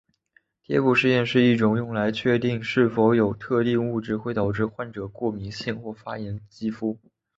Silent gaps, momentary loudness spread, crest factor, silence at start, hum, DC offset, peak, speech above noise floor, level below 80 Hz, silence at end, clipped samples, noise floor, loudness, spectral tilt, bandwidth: none; 14 LU; 18 dB; 0.7 s; none; under 0.1%; -6 dBFS; 41 dB; -54 dBFS; 0.4 s; under 0.1%; -64 dBFS; -24 LUFS; -7.5 dB/octave; 7.8 kHz